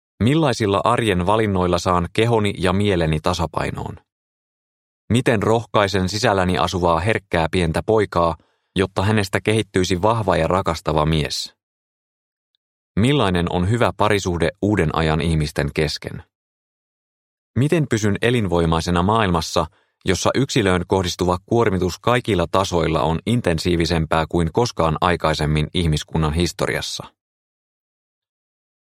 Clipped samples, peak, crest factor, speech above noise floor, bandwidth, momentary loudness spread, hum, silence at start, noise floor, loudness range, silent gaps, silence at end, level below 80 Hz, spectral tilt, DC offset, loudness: under 0.1%; 0 dBFS; 20 dB; over 71 dB; 15.5 kHz; 5 LU; none; 0.2 s; under -90 dBFS; 3 LU; 4.12-5.08 s, 11.63-12.95 s, 16.35-17.54 s; 1.85 s; -38 dBFS; -5.5 dB/octave; under 0.1%; -19 LUFS